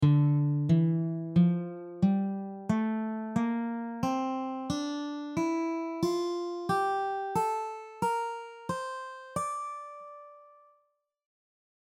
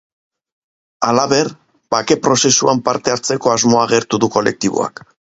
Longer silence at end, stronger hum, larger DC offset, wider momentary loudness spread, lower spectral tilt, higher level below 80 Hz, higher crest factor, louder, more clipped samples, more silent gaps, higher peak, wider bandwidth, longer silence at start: first, 1.5 s vs 0.5 s; neither; neither; first, 12 LU vs 8 LU; first, -7.5 dB/octave vs -3.5 dB/octave; second, -64 dBFS vs -54 dBFS; about the same, 16 dB vs 16 dB; second, -31 LUFS vs -15 LUFS; neither; neither; second, -14 dBFS vs 0 dBFS; first, 14 kHz vs 8 kHz; second, 0 s vs 1 s